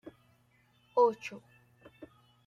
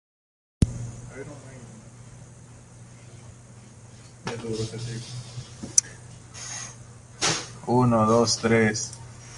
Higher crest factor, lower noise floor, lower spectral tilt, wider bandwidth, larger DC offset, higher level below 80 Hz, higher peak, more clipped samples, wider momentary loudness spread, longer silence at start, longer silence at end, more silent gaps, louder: second, 22 dB vs 28 dB; first, -68 dBFS vs -47 dBFS; about the same, -5 dB/octave vs -4 dB/octave; second, 7.4 kHz vs 11.5 kHz; neither; second, -78 dBFS vs -46 dBFS; second, -14 dBFS vs -2 dBFS; neither; about the same, 26 LU vs 26 LU; second, 0.05 s vs 0.6 s; first, 0.4 s vs 0 s; neither; second, -31 LUFS vs -25 LUFS